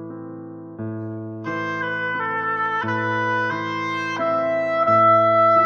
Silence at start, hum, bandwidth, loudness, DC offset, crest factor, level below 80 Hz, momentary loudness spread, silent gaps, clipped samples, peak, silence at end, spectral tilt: 0 s; none; 7 kHz; -20 LUFS; under 0.1%; 14 dB; -68 dBFS; 18 LU; none; under 0.1%; -6 dBFS; 0 s; -6.5 dB/octave